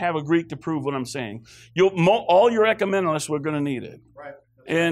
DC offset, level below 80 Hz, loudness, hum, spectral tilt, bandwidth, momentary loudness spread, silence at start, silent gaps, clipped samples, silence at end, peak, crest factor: under 0.1%; -62 dBFS; -22 LUFS; none; -5.5 dB/octave; 14 kHz; 24 LU; 0 s; none; under 0.1%; 0 s; -8 dBFS; 14 dB